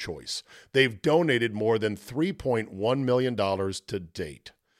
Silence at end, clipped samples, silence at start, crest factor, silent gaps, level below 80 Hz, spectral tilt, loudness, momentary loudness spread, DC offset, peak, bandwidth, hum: 0.3 s; under 0.1%; 0 s; 20 dB; none; -58 dBFS; -5.5 dB/octave; -27 LUFS; 12 LU; under 0.1%; -8 dBFS; 14.5 kHz; none